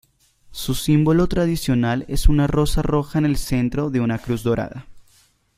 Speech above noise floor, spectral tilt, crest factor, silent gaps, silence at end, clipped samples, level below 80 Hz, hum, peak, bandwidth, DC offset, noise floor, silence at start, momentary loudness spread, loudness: 39 dB; -6.5 dB/octave; 16 dB; none; 0.55 s; under 0.1%; -28 dBFS; none; -2 dBFS; 16 kHz; under 0.1%; -58 dBFS; 0.5 s; 8 LU; -20 LUFS